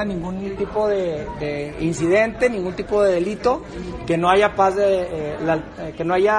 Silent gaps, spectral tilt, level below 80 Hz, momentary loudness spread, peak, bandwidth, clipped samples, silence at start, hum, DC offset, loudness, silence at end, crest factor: none; -6 dB/octave; -42 dBFS; 10 LU; -2 dBFS; 10.5 kHz; under 0.1%; 0 s; none; under 0.1%; -21 LUFS; 0 s; 18 dB